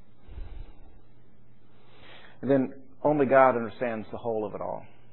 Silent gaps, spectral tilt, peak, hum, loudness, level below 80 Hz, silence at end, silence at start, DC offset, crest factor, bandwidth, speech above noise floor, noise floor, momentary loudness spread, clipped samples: none; -11 dB/octave; -6 dBFS; none; -26 LUFS; -50 dBFS; 0.3 s; 0.3 s; 0.8%; 24 dB; 4.2 kHz; 34 dB; -59 dBFS; 25 LU; under 0.1%